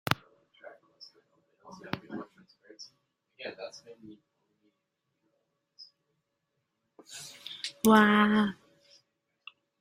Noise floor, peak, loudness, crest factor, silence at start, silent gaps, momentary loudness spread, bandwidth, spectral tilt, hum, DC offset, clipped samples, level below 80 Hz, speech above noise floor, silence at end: -82 dBFS; -4 dBFS; -27 LUFS; 30 dB; 0.1 s; none; 30 LU; 16 kHz; -5 dB/octave; none; under 0.1%; under 0.1%; -70 dBFS; 55 dB; 1.25 s